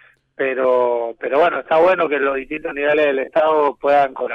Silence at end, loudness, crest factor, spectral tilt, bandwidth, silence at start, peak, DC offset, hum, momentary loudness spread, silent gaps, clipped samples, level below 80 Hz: 0 s; -17 LUFS; 10 dB; -6 dB/octave; 6.2 kHz; 0.4 s; -6 dBFS; under 0.1%; none; 7 LU; none; under 0.1%; -56 dBFS